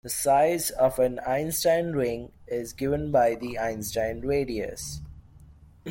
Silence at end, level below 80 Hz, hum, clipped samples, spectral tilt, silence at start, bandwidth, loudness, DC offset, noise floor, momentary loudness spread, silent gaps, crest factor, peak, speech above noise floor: 0 s; -48 dBFS; none; under 0.1%; -4.5 dB/octave; 0.05 s; 17 kHz; -26 LUFS; under 0.1%; -51 dBFS; 12 LU; none; 16 dB; -10 dBFS; 25 dB